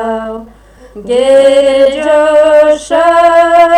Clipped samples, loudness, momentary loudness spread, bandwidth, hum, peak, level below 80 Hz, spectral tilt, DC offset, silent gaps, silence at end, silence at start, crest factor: 0.2%; -7 LUFS; 13 LU; 10.5 kHz; none; 0 dBFS; -40 dBFS; -3.5 dB/octave; under 0.1%; none; 0 s; 0 s; 8 dB